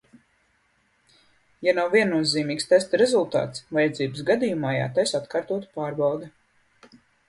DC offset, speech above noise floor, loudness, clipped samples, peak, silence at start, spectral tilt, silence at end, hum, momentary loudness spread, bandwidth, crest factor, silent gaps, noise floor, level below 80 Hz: under 0.1%; 43 dB; -24 LUFS; under 0.1%; -6 dBFS; 1.6 s; -4.5 dB/octave; 1 s; none; 8 LU; 11.5 kHz; 20 dB; none; -66 dBFS; -66 dBFS